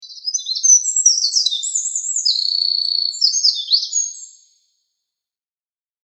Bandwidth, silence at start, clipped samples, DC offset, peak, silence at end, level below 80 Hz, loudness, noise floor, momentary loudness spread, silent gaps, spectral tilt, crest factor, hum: 8.8 kHz; 0 s; under 0.1%; under 0.1%; 0 dBFS; 1.8 s; under -90 dBFS; -15 LUFS; under -90 dBFS; 9 LU; none; 13.5 dB/octave; 20 dB; none